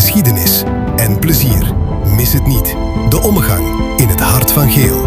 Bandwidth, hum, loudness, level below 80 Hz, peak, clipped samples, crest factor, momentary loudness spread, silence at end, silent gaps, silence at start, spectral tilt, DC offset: 16.5 kHz; none; -11 LUFS; -20 dBFS; 0 dBFS; 0.2%; 10 dB; 6 LU; 0 s; none; 0 s; -5 dB/octave; under 0.1%